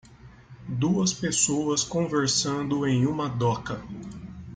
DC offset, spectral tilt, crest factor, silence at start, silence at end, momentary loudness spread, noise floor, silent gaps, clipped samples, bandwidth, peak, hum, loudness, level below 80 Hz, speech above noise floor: under 0.1%; -4 dB/octave; 16 dB; 0.1 s; 0 s; 16 LU; -49 dBFS; none; under 0.1%; 10 kHz; -10 dBFS; none; -25 LUFS; -54 dBFS; 23 dB